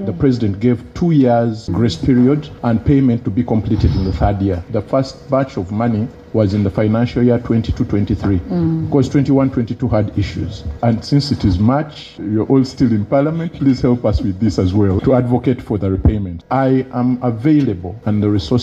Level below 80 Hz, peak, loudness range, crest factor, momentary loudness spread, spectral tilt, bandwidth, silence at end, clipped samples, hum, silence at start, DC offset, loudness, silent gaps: -32 dBFS; 0 dBFS; 2 LU; 14 dB; 6 LU; -8.5 dB/octave; 8 kHz; 0 s; under 0.1%; none; 0 s; under 0.1%; -16 LUFS; none